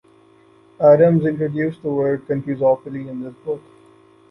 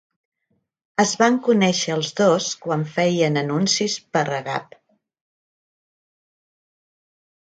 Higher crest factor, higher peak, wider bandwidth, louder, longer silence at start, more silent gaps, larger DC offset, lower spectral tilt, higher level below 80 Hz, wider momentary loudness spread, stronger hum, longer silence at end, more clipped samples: about the same, 18 dB vs 22 dB; about the same, -2 dBFS vs -2 dBFS; second, 5.6 kHz vs 9.4 kHz; about the same, -18 LUFS vs -20 LUFS; second, 0.8 s vs 1 s; neither; neither; first, -11 dB/octave vs -4 dB/octave; first, -60 dBFS vs -70 dBFS; first, 17 LU vs 7 LU; neither; second, 0.7 s vs 2.9 s; neither